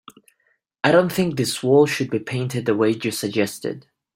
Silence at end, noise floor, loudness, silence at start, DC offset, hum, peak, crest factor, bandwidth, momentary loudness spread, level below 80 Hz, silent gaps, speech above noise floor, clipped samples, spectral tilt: 0.35 s; -68 dBFS; -21 LUFS; 0.85 s; under 0.1%; none; -2 dBFS; 18 dB; 16.5 kHz; 9 LU; -60 dBFS; none; 48 dB; under 0.1%; -5 dB/octave